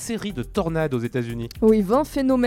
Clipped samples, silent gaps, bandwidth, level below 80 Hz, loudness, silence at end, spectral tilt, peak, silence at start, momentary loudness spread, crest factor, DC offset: under 0.1%; none; 16.5 kHz; -42 dBFS; -23 LUFS; 0 s; -6.5 dB/octave; -6 dBFS; 0 s; 9 LU; 16 dB; under 0.1%